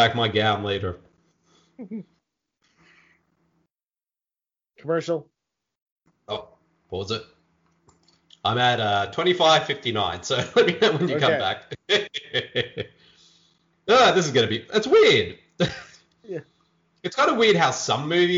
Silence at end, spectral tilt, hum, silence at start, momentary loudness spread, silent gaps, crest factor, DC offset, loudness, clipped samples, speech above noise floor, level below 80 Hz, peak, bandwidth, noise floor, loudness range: 0 s; -4 dB/octave; none; 0 s; 19 LU; 5.82-5.96 s; 18 dB; under 0.1%; -21 LUFS; under 0.1%; over 68 dB; -60 dBFS; -6 dBFS; 7.6 kHz; under -90 dBFS; 13 LU